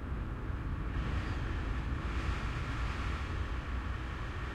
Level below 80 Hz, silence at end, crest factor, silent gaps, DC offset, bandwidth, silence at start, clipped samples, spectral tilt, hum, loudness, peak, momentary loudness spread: -38 dBFS; 0 s; 12 dB; none; under 0.1%; 9.8 kHz; 0 s; under 0.1%; -6.5 dB/octave; none; -38 LUFS; -24 dBFS; 3 LU